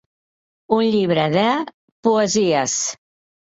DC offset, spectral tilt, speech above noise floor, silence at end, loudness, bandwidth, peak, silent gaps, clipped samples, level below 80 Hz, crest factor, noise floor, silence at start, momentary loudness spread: under 0.1%; -4 dB/octave; over 72 dB; 0.45 s; -19 LUFS; 8 kHz; -4 dBFS; 1.74-2.03 s; under 0.1%; -60 dBFS; 16 dB; under -90 dBFS; 0.7 s; 8 LU